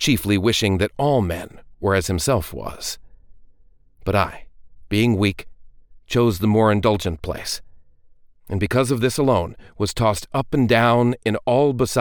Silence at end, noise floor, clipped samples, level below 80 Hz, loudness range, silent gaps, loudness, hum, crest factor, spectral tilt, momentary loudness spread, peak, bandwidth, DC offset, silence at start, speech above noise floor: 0 s; -51 dBFS; under 0.1%; -42 dBFS; 5 LU; none; -20 LUFS; none; 18 dB; -5.5 dB/octave; 13 LU; -4 dBFS; 19 kHz; under 0.1%; 0 s; 31 dB